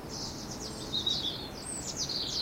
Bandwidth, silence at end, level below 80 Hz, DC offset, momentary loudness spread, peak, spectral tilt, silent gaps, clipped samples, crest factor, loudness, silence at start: 16 kHz; 0 s; -52 dBFS; under 0.1%; 9 LU; -18 dBFS; -2 dB/octave; none; under 0.1%; 18 dB; -33 LUFS; 0 s